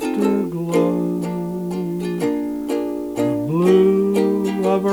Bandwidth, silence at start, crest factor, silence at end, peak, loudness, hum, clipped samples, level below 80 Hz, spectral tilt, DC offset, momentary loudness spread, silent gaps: over 20 kHz; 0 s; 14 dB; 0 s; -4 dBFS; -20 LUFS; 60 Hz at -40 dBFS; under 0.1%; -52 dBFS; -7.5 dB/octave; under 0.1%; 10 LU; none